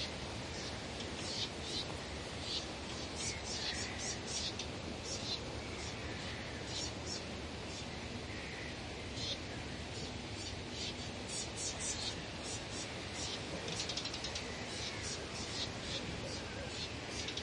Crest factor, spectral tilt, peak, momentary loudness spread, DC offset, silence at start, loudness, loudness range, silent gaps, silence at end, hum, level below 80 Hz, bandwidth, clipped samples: 16 dB; -3 dB/octave; -26 dBFS; 5 LU; under 0.1%; 0 s; -41 LUFS; 3 LU; none; 0 s; none; -56 dBFS; 11.5 kHz; under 0.1%